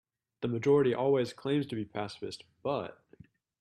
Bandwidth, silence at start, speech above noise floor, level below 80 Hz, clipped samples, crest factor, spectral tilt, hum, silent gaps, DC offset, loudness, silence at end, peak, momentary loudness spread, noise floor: 11.5 kHz; 0.4 s; 28 dB; -70 dBFS; under 0.1%; 16 dB; -7 dB/octave; none; none; under 0.1%; -31 LUFS; 0.65 s; -16 dBFS; 14 LU; -59 dBFS